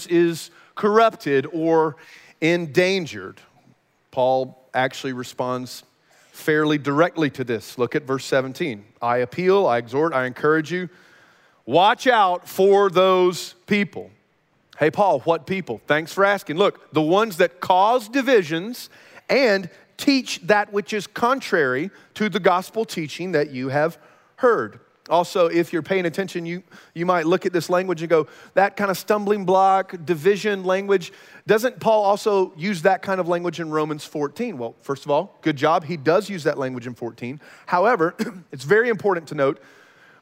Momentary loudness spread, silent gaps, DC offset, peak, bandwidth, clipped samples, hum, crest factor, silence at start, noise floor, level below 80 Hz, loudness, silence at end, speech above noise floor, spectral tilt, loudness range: 12 LU; none; under 0.1%; -2 dBFS; 16 kHz; under 0.1%; none; 18 dB; 0 s; -64 dBFS; -72 dBFS; -21 LUFS; 0.65 s; 43 dB; -5.5 dB/octave; 4 LU